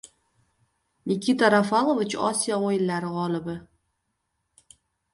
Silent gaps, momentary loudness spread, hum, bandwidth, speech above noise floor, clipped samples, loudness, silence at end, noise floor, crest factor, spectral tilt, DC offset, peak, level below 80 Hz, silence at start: none; 12 LU; none; 11.5 kHz; 54 dB; under 0.1%; -24 LUFS; 1.5 s; -77 dBFS; 22 dB; -4.5 dB/octave; under 0.1%; -4 dBFS; -66 dBFS; 1.05 s